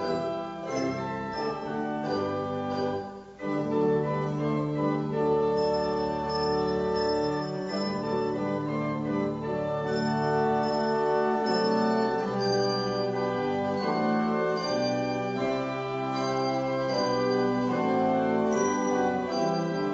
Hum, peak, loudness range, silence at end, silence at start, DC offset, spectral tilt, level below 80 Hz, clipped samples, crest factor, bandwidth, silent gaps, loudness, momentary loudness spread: none; -14 dBFS; 3 LU; 0 s; 0 s; under 0.1%; -6 dB/octave; -56 dBFS; under 0.1%; 14 dB; 8 kHz; none; -28 LUFS; 6 LU